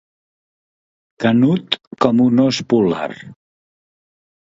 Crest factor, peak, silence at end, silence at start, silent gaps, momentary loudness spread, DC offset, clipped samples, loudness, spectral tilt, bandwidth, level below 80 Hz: 18 dB; 0 dBFS; 1.2 s; 1.2 s; 1.87-1.91 s; 10 LU; under 0.1%; under 0.1%; -16 LUFS; -6.5 dB/octave; 7.8 kHz; -58 dBFS